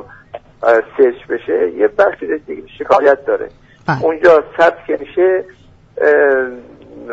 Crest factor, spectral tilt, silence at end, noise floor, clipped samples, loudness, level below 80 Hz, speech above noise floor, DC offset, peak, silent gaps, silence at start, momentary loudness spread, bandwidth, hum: 14 dB; -7 dB/octave; 0 s; -35 dBFS; under 0.1%; -14 LUFS; -50 dBFS; 21 dB; under 0.1%; 0 dBFS; none; 0.35 s; 18 LU; 7.6 kHz; none